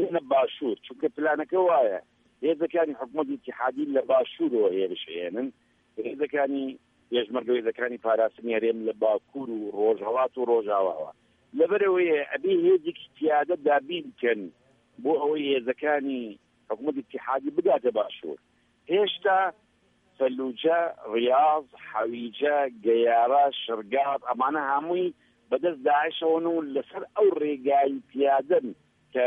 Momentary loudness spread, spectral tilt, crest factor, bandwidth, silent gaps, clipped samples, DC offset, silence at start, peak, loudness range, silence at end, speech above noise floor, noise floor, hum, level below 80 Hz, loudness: 11 LU; -7 dB/octave; 14 dB; 3.8 kHz; none; under 0.1%; under 0.1%; 0 s; -12 dBFS; 4 LU; 0 s; 40 dB; -66 dBFS; none; -78 dBFS; -26 LUFS